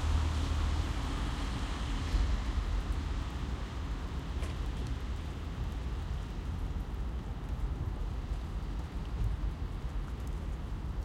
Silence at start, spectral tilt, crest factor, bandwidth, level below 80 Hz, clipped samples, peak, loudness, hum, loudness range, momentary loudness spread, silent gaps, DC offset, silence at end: 0 s; -6 dB/octave; 16 dB; 12 kHz; -36 dBFS; under 0.1%; -20 dBFS; -38 LUFS; none; 4 LU; 7 LU; none; under 0.1%; 0 s